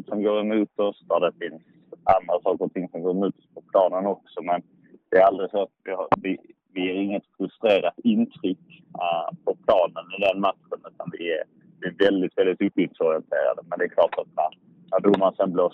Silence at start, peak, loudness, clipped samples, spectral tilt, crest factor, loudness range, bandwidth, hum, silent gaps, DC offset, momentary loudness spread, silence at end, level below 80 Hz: 0.1 s; -4 dBFS; -24 LUFS; under 0.1%; -8 dB/octave; 20 dB; 2 LU; 5.8 kHz; none; none; under 0.1%; 11 LU; 0.05 s; -64 dBFS